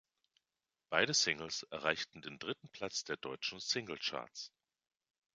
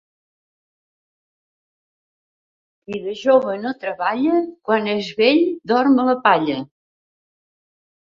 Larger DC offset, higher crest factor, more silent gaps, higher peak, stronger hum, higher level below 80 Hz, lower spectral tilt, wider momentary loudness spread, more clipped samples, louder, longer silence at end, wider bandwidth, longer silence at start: neither; first, 28 dB vs 20 dB; neither; second, -12 dBFS vs 0 dBFS; neither; second, -76 dBFS vs -68 dBFS; second, -1.5 dB/octave vs -6 dB/octave; about the same, 13 LU vs 12 LU; neither; second, -37 LUFS vs -18 LUFS; second, 0.85 s vs 1.35 s; first, 9.6 kHz vs 7.2 kHz; second, 0.9 s vs 2.9 s